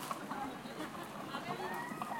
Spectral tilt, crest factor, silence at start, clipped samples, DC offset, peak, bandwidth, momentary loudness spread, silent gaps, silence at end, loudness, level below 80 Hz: -4 dB/octave; 18 dB; 0 s; under 0.1%; under 0.1%; -24 dBFS; 16.5 kHz; 4 LU; none; 0 s; -43 LUFS; -74 dBFS